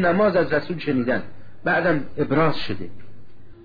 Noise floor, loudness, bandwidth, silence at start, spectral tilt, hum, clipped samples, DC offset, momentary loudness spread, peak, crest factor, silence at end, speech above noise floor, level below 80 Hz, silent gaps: -43 dBFS; -22 LUFS; 5 kHz; 0 s; -8.5 dB/octave; none; under 0.1%; 3%; 11 LU; -10 dBFS; 14 dB; 0 s; 22 dB; -48 dBFS; none